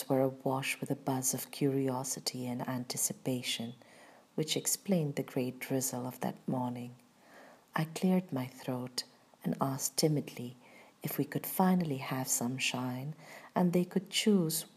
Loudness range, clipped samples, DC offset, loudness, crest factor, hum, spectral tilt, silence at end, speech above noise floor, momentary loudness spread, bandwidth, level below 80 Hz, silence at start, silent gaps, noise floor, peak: 4 LU; under 0.1%; under 0.1%; -34 LUFS; 20 dB; none; -4.5 dB/octave; 0.1 s; 24 dB; 10 LU; 15.5 kHz; -80 dBFS; 0 s; none; -58 dBFS; -14 dBFS